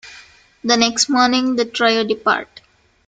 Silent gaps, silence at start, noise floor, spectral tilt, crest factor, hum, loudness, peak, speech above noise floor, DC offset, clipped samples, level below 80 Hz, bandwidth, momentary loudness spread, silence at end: none; 0.05 s; -49 dBFS; -2 dB/octave; 18 dB; none; -16 LUFS; -2 dBFS; 33 dB; under 0.1%; under 0.1%; -58 dBFS; 9.6 kHz; 5 LU; 0.65 s